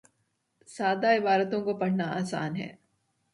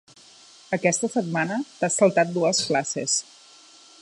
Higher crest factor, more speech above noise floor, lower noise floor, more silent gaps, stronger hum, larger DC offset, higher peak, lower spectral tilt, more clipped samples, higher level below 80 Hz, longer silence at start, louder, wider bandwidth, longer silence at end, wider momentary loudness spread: about the same, 18 dB vs 20 dB; first, 48 dB vs 28 dB; first, -76 dBFS vs -51 dBFS; neither; neither; neither; second, -12 dBFS vs -6 dBFS; first, -6 dB/octave vs -3.5 dB/octave; neither; about the same, -72 dBFS vs -72 dBFS; about the same, 0.7 s vs 0.7 s; second, -28 LUFS vs -23 LUFS; about the same, 11.5 kHz vs 11.5 kHz; second, 0.65 s vs 0.8 s; first, 13 LU vs 6 LU